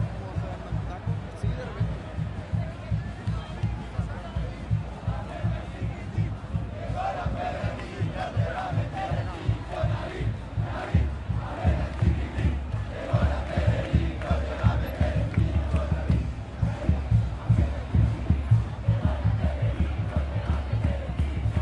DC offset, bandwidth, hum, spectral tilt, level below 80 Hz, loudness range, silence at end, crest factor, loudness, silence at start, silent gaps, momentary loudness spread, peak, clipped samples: under 0.1%; 12 kHz; none; -8 dB/octave; -32 dBFS; 6 LU; 0 s; 18 dB; -29 LUFS; 0 s; none; 8 LU; -8 dBFS; under 0.1%